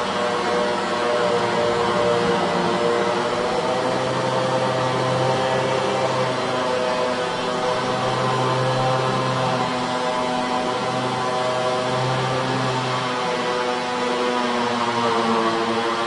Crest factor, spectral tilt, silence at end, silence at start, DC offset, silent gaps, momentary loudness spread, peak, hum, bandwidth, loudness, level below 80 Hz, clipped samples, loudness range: 14 dB; -4.5 dB/octave; 0 s; 0 s; under 0.1%; none; 3 LU; -8 dBFS; none; 11.5 kHz; -21 LUFS; -56 dBFS; under 0.1%; 2 LU